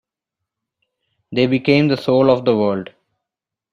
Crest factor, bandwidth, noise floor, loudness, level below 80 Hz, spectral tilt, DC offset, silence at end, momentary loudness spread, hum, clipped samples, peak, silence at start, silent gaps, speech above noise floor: 18 dB; 9.6 kHz; -85 dBFS; -16 LUFS; -58 dBFS; -8 dB/octave; under 0.1%; 0.9 s; 11 LU; none; under 0.1%; -2 dBFS; 1.3 s; none; 70 dB